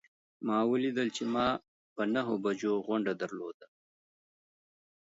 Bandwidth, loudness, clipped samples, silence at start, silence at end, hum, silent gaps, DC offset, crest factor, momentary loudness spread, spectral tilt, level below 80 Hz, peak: 8 kHz; -32 LUFS; under 0.1%; 0.4 s; 1.35 s; none; 1.68-1.96 s, 3.54-3.60 s; under 0.1%; 18 dB; 10 LU; -5.5 dB/octave; -70 dBFS; -16 dBFS